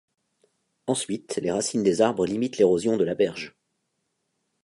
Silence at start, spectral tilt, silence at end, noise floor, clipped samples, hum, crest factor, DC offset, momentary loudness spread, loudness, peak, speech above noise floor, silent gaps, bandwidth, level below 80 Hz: 0.85 s; -5 dB/octave; 1.15 s; -77 dBFS; under 0.1%; none; 20 dB; under 0.1%; 9 LU; -24 LUFS; -6 dBFS; 53 dB; none; 11.5 kHz; -62 dBFS